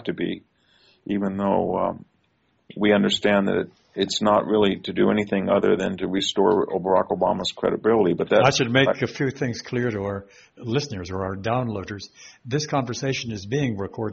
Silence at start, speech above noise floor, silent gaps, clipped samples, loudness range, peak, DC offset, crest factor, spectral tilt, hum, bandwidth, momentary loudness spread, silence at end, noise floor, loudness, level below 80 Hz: 0 s; 44 dB; none; under 0.1%; 7 LU; -4 dBFS; under 0.1%; 20 dB; -4.5 dB/octave; none; 8 kHz; 11 LU; 0 s; -67 dBFS; -23 LUFS; -56 dBFS